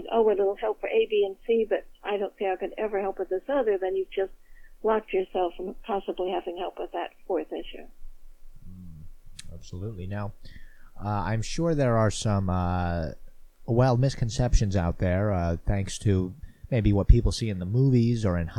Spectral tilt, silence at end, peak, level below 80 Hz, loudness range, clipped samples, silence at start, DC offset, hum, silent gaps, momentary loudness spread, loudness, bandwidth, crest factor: -7 dB/octave; 0 s; -4 dBFS; -36 dBFS; 11 LU; under 0.1%; 0 s; under 0.1%; none; none; 15 LU; -27 LUFS; 11.5 kHz; 22 dB